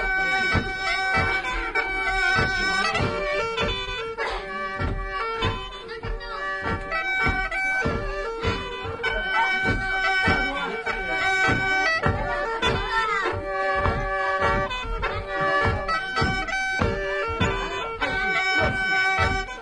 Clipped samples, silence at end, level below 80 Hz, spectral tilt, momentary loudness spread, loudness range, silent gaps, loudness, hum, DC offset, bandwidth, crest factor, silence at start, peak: under 0.1%; 0 s; -36 dBFS; -4.5 dB/octave; 8 LU; 4 LU; none; -24 LUFS; none; under 0.1%; 10.5 kHz; 18 dB; 0 s; -8 dBFS